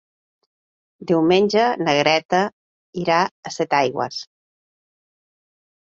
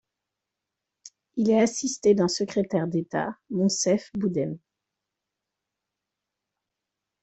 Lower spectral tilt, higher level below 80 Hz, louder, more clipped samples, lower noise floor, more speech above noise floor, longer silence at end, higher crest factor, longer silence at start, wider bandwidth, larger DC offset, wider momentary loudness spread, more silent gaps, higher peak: about the same, -5 dB/octave vs -5 dB/octave; about the same, -64 dBFS vs -68 dBFS; first, -19 LUFS vs -25 LUFS; neither; first, under -90 dBFS vs -86 dBFS; first, over 71 dB vs 62 dB; second, 1.7 s vs 2.65 s; about the same, 18 dB vs 20 dB; about the same, 1 s vs 1.05 s; about the same, 7.8 kHz vs 8.4 kHz; neither; first, 12 LU vs 9 LU; first, 2.25-2.29 s, 2.53-2.93 s, 3.31-3.43 s vs none; first, -2 dBFS vs -8 dBFS